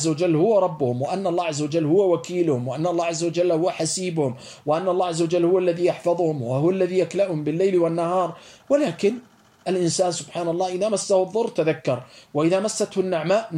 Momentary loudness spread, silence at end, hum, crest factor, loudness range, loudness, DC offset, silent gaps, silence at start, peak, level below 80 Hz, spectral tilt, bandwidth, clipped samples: 6 LU; 0 s; none; 14 dB; 2 LU; -22 LUFS; under 0.1%; none; 0 s; -8 dBFS; -70 dBFS; -5.5 dB/octave; 12 kHz; under 0.1%